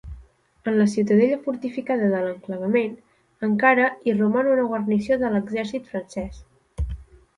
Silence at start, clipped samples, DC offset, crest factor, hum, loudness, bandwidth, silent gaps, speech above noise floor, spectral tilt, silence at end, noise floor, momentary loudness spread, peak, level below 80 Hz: 0.05 s; under 0.1%; under 0.1%; 20 dB; none; -23 LUFS; 10.5 kHz; none; 29 dB; -7 dB/octave; 0.35 s; -50 dBFS; 14 LU; -4 dBFS; -42 dBFS